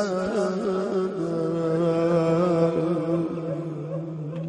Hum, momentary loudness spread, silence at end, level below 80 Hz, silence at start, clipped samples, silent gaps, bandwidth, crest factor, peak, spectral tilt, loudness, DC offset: none; 10 LU; 0 s; -60 dBFS; 0 s; under 0.1%; none; 10 kHz; 14 dB; -12 dBFS; -8 dB/octave; -25 LUFS; under 0.1%